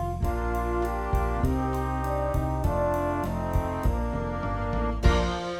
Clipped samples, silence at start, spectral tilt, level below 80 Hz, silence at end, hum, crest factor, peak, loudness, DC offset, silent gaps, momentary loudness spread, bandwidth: under 0.1%; 0 s; -7 dB/octave; -30 dBFS; 0 s; none; 18 dB; -8 dBFS; -28 LUFS; under 0.1%; none; 4 LU; 16 kHz